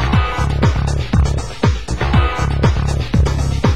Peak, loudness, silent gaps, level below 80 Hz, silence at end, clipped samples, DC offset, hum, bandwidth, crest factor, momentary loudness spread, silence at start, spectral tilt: 0 dBFS; -17 LUFS; none; -18 dBFS; 0 s; under 0.1%; 3%; none; 12 kHz; 14 dB; 3 LU; 0 s; -6.5 dB/octave